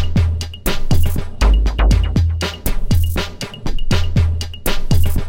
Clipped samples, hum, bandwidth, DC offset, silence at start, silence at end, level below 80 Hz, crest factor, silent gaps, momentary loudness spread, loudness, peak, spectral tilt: under 0.1%; none; 17 kHz; 2%; 0 s; 0 s; -18 dBFS; 12 dB; none; 7 LU; -19 LUFS; -2 dBFS; -5.5 dB/octave